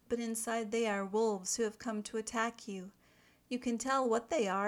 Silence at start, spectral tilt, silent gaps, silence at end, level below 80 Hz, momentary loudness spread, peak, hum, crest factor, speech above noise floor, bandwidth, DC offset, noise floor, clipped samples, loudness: 0.1 s; -3.5 dB/octave; none; 0 s; -72 dBFS; 10 LU; -18 dBFS; none; 16 dB; 32 dB; 17.5 kHz; under 0.1%; -67 dBFS; under 0.1%; -35 LUFS